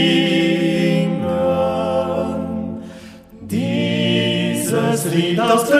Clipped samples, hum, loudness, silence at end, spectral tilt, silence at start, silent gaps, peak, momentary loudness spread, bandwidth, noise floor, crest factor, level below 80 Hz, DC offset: under 0.1%; none; -18 LUFS; 0 s; -5 dB/octave; 0 s; none; -2 dBFS; 10 LU; 15.5 kHz; -38 dBFS; 16 dB; -50 dBFS; under 0.1%